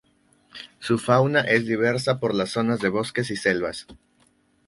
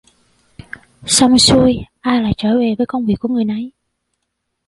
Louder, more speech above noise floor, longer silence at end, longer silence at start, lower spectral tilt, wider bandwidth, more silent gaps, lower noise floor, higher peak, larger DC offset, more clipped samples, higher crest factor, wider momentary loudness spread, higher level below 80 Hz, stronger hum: second, -23 LUFS vs -14 LUFS; second, 40 dB vs 59 dB; second, 0.75 s vs 1 s; second, 0.55 s vs 1.05 s; first, -5.5 dB/octave vs -4 dB/octave; about the same, 11.5 kHz vs 12 kHz; neither; second, -63 dBFS vs -73 dBFS; second, -4 dBFS vs 0 dBFS; neither; neither; about the same, 20 dB vs 16 dB; second, 14 LU vs 22 LU; second, -58 dBFS vs -40 dBFS; neither